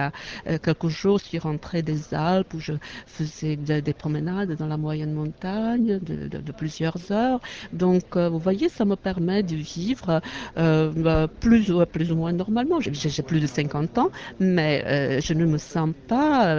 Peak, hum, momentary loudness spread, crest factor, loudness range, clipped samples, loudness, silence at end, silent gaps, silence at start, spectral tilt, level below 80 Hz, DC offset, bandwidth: -6 dBFS; none; 8 LU; 16 dB; 5 LU; under 0.1%; -24 LUFS; 0 s; none; 0 s; -7 dB/octave; -46 dBFS; under 0.1%; 7.4 kHz